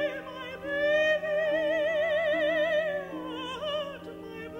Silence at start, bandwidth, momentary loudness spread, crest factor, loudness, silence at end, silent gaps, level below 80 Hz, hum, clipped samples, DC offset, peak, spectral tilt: 0 s; 9.4 kHz; 13 LU; 12 dB; -28 LUFS; 0 s; none; -64 dBFS; none; under 0.1%; under 0.1%; -16 dBFS; -4.5 dB/octave